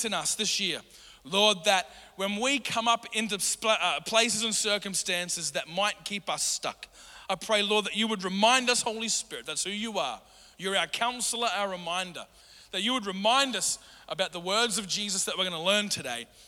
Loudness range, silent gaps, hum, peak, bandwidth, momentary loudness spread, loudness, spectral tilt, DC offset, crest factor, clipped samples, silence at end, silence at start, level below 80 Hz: 3 LU; none; none; -8 dBFS; over 20 kHz; 11 LU; -27 LUFS; -1.5 dB/octave; under 0.1%; 20 dB; under 0.1%; 0 s; 0 s; -66 dBFS